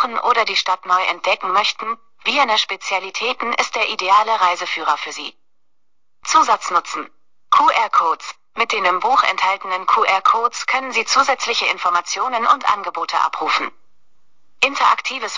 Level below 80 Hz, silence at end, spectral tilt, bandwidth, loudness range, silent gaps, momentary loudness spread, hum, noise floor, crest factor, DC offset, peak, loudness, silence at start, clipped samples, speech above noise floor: -66 dBFS; 0 s; 0 dB/octave; 7.6 kHz; 3 LU; none; 8 LU; none; -78 dBFS; 14 dB; 0.4%; -4 dBFS; -17 LUFS; 0 s; under 0.1%; 60 dB